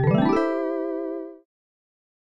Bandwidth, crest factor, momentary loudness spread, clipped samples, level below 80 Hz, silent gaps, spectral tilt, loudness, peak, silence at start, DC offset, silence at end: 9 kHz; 16 dB; 14 LU; under 0.1%; -54 dBFS; none; -9 dB/octave; -24 LUFS; -10 dBFS; 0 s; under 0.1%; 0.95 s